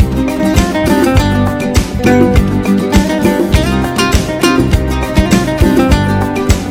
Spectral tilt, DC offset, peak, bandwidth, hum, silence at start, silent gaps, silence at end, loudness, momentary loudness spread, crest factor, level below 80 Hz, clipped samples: -6 dB/octave; under 0.1%; 0 dBFS; 16.5 kHz; none; 0 s; none; 0 s; -11 LUFS; 4 LU; 10 dB; -18 dBFS; 1%